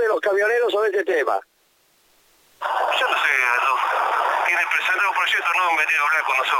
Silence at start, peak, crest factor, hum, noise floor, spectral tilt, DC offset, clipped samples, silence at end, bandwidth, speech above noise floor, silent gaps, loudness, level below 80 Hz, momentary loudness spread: 0 s; -6 dBFS; 16 dB; none; -61 dBFS; 0 dB/octave; under 0.1%; under 0.1%; 0 s; 17 kHz; 41 dB; none; -19 LUFS; -74 dBFS; 4 LU